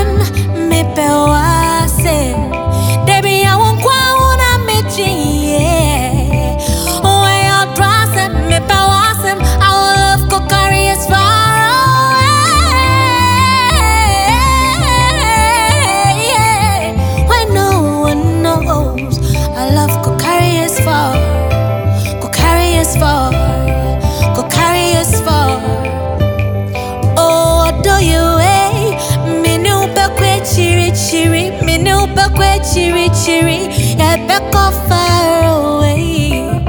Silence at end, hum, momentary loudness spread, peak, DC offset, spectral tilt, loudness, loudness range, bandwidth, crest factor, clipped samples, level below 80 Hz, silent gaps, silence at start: 0 s; none; 6 LU; 0 dBFS; under 0.1%; -4.5 dB/octave; -11 LUFS; 3 LU; over 20 kHz; 10 dB; under 0.1%; -20 dBFS; none; 0 s